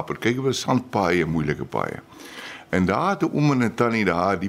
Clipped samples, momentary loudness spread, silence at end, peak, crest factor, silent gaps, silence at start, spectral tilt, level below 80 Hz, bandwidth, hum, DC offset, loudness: under 0.1%; 16 LU; 0 s; -6 dBFS; 16 dB; none; 0 s; -6 dB/octave; -50 dBFS; 15.5 kHz; none; under 0.1%; -22 LUFS